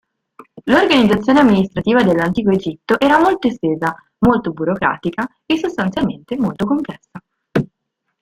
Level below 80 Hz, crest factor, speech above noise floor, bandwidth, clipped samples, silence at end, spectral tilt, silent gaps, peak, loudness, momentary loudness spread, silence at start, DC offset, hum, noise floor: -46 dBFS; 16 dB; 59 dB; 14.5 kHz; under 0.1%; 0.55 s; -6.5 dB/octave; none; 0 dBFS; -16 LUFS; 10 LU; 0.4 s; under 0.1%; none; -74 dBFS